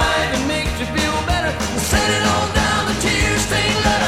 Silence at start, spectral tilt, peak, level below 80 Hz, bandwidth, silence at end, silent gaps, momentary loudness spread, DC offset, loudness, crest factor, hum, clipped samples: 0 s; -3.5 dB/octave; -2 dBFS; -28 dBFS; 16.5 kHz; 0 s; none; 4 LU; 0.5%; -18 LUFS; 16 dB; none; under 0.1%